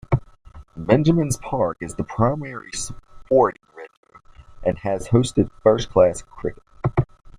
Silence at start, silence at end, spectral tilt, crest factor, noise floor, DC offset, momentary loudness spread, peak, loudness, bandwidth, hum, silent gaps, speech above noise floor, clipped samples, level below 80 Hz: 0.1 s; 0.1 s; -6.5 dB/octave; 20 dB; -44 dBFS; under 0.1%; 13 LU; -2 dBFS; -21 LUFS; 15 kHz; none; 3.97-4.03 s; 24 dB; under 0.1%; -42 dBFS